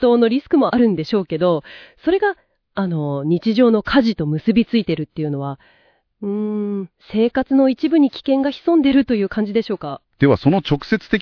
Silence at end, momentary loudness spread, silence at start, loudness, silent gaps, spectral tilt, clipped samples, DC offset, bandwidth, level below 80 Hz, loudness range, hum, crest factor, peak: 0 s; 11 LU; 0 s; -18 LUFS; none; -8.5 dB/octave; under 0.1%; under 0.1%; 5.4 kHz; -46 dBFS; 4 LU; none; 16 dB; 0 dBFS